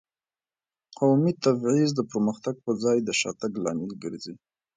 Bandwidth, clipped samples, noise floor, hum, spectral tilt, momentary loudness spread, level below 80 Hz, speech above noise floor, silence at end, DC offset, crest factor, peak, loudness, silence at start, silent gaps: 9.6 kHz; under 0.1%; under -90 dBFS; none; -5.5 dB/octave; 13 LU; -68 dBFS; over 65 dB; 0.4 s; under 0.1%; 18 dB; -8 dBFS; -26 LUFS; 1 s; none